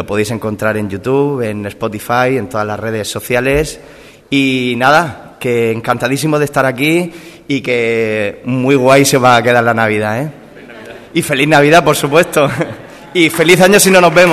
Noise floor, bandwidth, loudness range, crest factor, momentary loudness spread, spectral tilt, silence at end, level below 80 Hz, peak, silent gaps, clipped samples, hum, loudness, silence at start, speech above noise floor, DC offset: -33 dBFS; 14.5 kHz; 5 LU; 12 dB; 13 LU; -4.5 dB/octave; 0 s; -42 dBFS; 0 dBFS; none; 0.5%; none; -12 LUFS; 0 s; 21 dB; under 0.1%